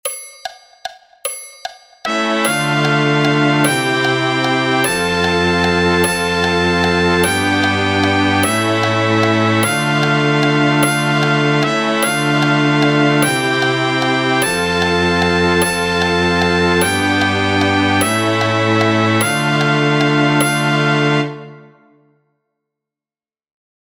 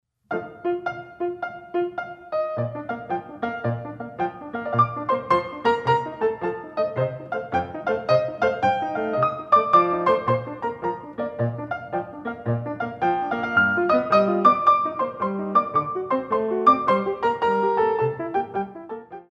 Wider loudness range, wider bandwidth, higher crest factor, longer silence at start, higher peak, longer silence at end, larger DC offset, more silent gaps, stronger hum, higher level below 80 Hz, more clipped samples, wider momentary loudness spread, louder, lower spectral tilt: second, 3 LU vs 8 LU; first, 16.5 kHz vs 8 kHz; about the same, 16 dB vs 20 dB; second, 0.05 s vs 0.3 s; first, 0 dBFS vs -4 dBFS; first, 2.4 s vs 0.1 s; neither; neither; neither; first, -44 dBFS vs -58 dBFS; neither; second, 5 LU vs 12 LU; first, -14 LUFS vs -23 LUFS; second, -4.5 dB/octave vs -7.5 dB/octave